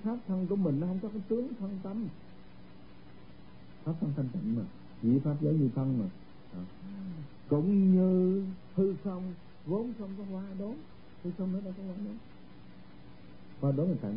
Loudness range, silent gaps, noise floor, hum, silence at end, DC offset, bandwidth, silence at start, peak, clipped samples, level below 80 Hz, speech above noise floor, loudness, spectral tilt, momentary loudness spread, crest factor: 9 LU; none; -54 dBFS; none; 0 s; 0.3%; 5.2 kHz; 0 s; -16 dBFS; under 0.1%; -64 dBFS; 22 dB; -33 LUFS; -13 dB/octave; 18 LU; 16 dB